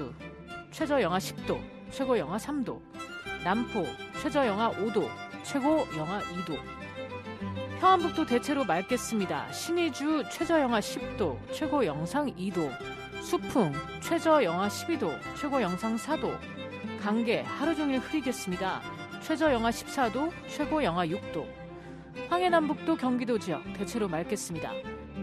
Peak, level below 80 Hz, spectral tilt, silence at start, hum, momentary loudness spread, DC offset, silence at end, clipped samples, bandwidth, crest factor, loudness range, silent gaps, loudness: -10 dBFS; -56 dBFS; -5 dB/octave; 0 s; none; 13 LU; under 0.1%; 0 s; under 0.1%; 14 kHz; 20 dB; 2 LU; none; -30 LUFS